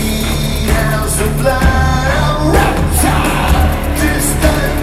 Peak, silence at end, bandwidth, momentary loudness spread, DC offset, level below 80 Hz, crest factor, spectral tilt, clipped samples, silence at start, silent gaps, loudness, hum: 0 dBFS; 0 s; 16 kHz; 3 LU; under 0.1%; -16 dBFS; 12 dB; -5 dB/octave; under 0.1%; 0 s; none; -13 LUFS; none